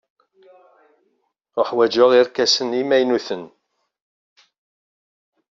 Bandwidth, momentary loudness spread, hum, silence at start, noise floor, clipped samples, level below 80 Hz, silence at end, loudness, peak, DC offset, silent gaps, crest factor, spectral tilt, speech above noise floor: 7.6 kHz; 15 LU; none; 1.55 s; -69 dBFS; under 0.1%; -70 dBFS; 2.05 s; -18 LUFS; -2 dBFS; under 0.1%; none; 20 dB; -1.5 dB/octave; 52 dB